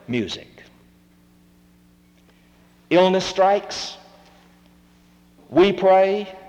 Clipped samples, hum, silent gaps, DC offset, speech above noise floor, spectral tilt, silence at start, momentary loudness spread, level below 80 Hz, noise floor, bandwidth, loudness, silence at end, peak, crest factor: under 0.1%; 60 Hz at -60 dBFS; none; under 0.1%; 36 dB; -5 dB/octave; 0.1 s; 15 LU; -56 dBFS; -54 dBFS; 9.4 kHz; -19 LUFS; 0.1 s; -6 dBFS; 18 dB